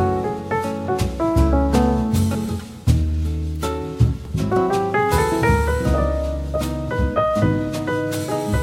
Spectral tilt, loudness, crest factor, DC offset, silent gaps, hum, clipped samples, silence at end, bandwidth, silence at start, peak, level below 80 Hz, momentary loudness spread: -7 dB/octave; -21 LUFS; 16 dB; under 0.1%; none; none; under 0.1%; 0 s; 16 kHz; 0 s; -4 dBFS; -26 dBFS; 7 LU